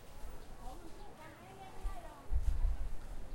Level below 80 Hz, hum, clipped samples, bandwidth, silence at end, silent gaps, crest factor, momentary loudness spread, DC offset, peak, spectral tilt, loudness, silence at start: -40 dBFS; none; under 0.1%; 16 kHz; 0 s; none; 18 dB; 14 LU; under 0.1%; -20 dBFS; -6 dB/octave; -46 LUFS; 0 s